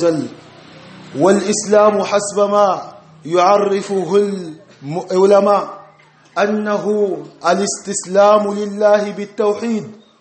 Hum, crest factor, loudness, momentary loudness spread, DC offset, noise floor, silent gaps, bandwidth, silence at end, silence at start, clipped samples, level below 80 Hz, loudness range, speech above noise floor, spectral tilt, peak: none; 16 dB; -15 LUFS; 14 LU; under 0.1%; -47 dBFS; none; 8.8 kHz; 0.25 s; 0 s; under 0.1%; -64 dBFS; 2 LU; 33 dB; -4.5 dB/octave; 0 dBFS